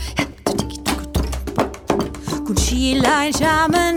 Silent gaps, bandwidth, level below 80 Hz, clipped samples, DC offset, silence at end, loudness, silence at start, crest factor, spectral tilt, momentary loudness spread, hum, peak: none; 19.5 kHz; -28 dBFS; under 0.1%; under 0.1%; 0 s; -19 LUFS; 0 s; 18 dB; -4 dB/octave; 8 LU; none; -2 dBFS